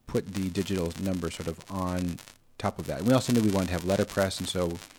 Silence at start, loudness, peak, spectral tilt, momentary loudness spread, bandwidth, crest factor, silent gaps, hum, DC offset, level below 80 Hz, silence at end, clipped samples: 0.05 s; -29 LUFS; -10 dBFS; -5.5 dB/octave; 10 LU; 20 kHz; 18 dB; none; none; under 0.1%; -52 dBFS; 0.1 s; under 0.1%